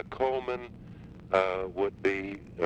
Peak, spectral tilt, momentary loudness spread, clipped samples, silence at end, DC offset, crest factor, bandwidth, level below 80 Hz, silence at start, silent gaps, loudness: -12 dBFS; -6.5 dB/octave; 20 LU; under 0.1%; 0 s; under 0.1%; 20 dB; 8.6 kHz; -56 dBFS; 0 s; none; -31 LUFS